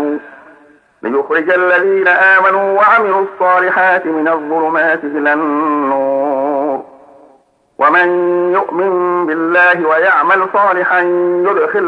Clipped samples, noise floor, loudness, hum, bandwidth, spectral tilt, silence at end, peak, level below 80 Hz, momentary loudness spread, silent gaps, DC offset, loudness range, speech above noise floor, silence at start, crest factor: under 0.1%; -50 dBFS; -12 LUFS; none; 5.2 kHz; -6.5 dB/octave; 0 s; 0 dBFS; -68 dBFS; 6 LU; none; under 0.1%; 4 LU; 39 dB; 0 s; 12 dB